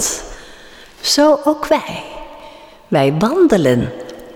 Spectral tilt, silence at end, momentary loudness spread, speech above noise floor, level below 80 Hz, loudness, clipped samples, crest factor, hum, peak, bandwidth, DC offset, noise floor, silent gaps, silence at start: -4.5 dB/octave; 0 s; 21 LU; 26 dB; -42 dBFS; -15 LUFS; under 0.1%; 14 dB; none; -4 dBFS; 18.5 kHz; under 0.1%; -39 dBFS; none; 0 s